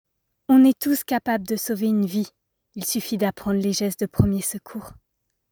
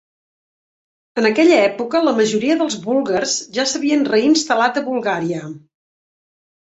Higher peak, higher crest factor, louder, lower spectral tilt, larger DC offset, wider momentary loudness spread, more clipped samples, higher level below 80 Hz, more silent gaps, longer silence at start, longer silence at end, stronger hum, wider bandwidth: about the same, -4 dBFS vs -2 dBFS; about the same, 20 dB vs 16 dB; second, -22 LUFS vs -17 LUFS; first, -5.5 dB/octave vs -3.5 dB/octave; neither; first, 17 LU vs 8 LU; neither; first, -48 dBFS vs -62 dBFS; neither; second, 0.5 s vs 1.15 s; second, 0.6 s vs 1.1 s; neither; first, over 20 kHz vs 8.2 kHz